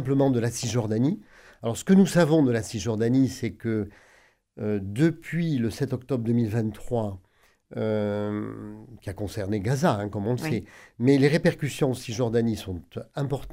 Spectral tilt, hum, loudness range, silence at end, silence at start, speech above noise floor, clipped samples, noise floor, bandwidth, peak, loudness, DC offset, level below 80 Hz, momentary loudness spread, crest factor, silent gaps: -6.5 dB/octave; none; 6 LU; 0 s; 0 s; 35 dB; under 0.1%; -60 dBFS; 16 kHz; -6 dBFS; -26 LUFS; under 0.1%; -54 dBFS; 15 LU; 18 dB; none